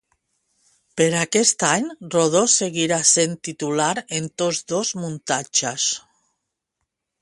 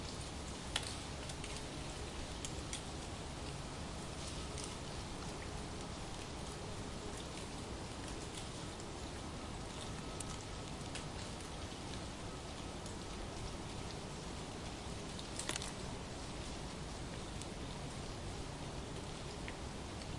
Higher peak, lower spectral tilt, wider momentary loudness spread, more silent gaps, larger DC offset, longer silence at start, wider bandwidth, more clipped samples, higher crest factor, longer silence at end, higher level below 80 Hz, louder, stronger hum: first, -2 dBFS vs -16 dBFS; second, -2.5 dB/octave vs -4 dB/octave; first, 10 LU vs 2 LU; neither; neither; first, 0.95 s vs 0 s; about the same, 11.5 kHz vs 11.5 kHz; neither; second, 20 dB vs 30 dB; first, 1.25 s vs 0 s; second, -64 dBFS vs -52 dBFS; first, -20 LUFS vs -45 LUFS; neither